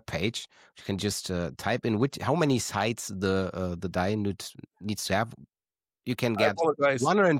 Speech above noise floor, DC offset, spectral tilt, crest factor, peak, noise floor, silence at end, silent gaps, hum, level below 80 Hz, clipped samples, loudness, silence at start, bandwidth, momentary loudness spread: over 62 dB; under 0.1%; -5 dB/octave; 18 dB; -10 dBFS; under -90 dBFS; 0 s; none; none; -58 dBFS; under 0.1%; -28 LUFS; 0.1 s; 16.5 kHz; 12 LU